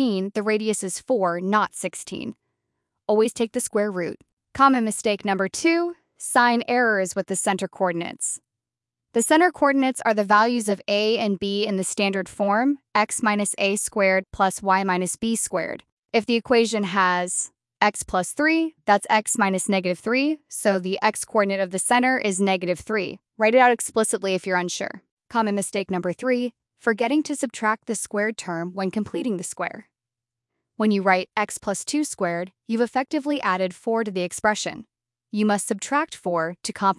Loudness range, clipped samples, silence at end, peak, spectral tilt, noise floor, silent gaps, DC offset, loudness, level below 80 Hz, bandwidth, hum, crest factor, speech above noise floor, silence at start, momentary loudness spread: 4 LU; under 0.1%; 0.05 s; -2 dBFS; -3.5 dB/octave; -88 dBFS; 4.33-4.37 s, 15.92-16.03 s, 25.11-25.17 s; under 0.1%; -23 LUFS; -62 dBFS; 12 kHz; none; 22 dB; 66 dB; 0 s; 9 LU